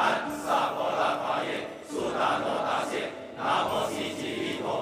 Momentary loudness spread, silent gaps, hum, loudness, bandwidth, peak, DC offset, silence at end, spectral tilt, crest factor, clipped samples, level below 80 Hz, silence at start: 7 LU; none; none; -29 LUFS; 15 kHz; -12 dBFS; under 0.1%; 0 s; -4 dB/octave; 18 dB; under 0.1%; -64 dBFS; 0 s